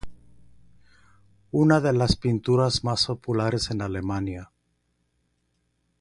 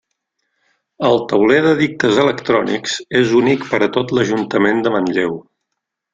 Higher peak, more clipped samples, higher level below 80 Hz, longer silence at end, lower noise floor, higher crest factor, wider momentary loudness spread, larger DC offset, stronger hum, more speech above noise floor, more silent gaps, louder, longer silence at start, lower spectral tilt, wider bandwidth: second, -6 dBFS vs -2 dBFS; neither; first, -44 dBFS vs -54 dBFS; first, 1.55 s vs 0.75 s; second, -72 dBFS vs -77 dBFS; first, 22 dB vs 16 dB; about the same, 9 LU vs 7 LU; neither; first, 60 Hz at -45 dBFS vs none; second, 49 dB vs 62 dB; neither; second, -24 LUFS vs -15 LUFS; second, 0.05 s vs 1 s; about the same, -6 dB/octave vs -5.5 dB/octave; first, 11.5 kHz vs 9.2 kHz